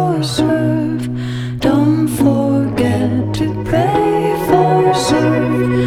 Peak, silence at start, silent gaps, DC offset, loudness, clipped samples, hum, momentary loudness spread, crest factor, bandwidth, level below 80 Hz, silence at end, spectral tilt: 0 dBFS; 0 s; none; under 0.1%; -15 LUFS; under 0.1%; none; 6 LU; 14 dB; 16 kHz; -38 dBFS; 0 s; -6.5 dB/octave